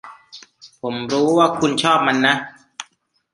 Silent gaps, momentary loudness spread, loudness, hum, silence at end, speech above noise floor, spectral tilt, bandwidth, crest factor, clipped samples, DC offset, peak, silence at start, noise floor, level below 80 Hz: none; 20 LU; -17 LUFS; none; 0.5 s; 44 dB; -4 dB/octave; 11.5 kHz; 20 dB; under 0.1%; under 0.1%; 0 dBFS; 0.05 s; -61 dBFS; -62 dBFS